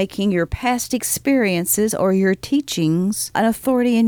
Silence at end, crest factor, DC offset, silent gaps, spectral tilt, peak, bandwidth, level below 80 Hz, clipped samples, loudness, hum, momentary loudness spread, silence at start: 0 s; 12 dB; under 0.1%; none; -4.5 dB/octave; -6 dBFS; over 20 kHz; -44 dBFS; under 0.1%; -19 LUFS; none; 3 LU; 0 s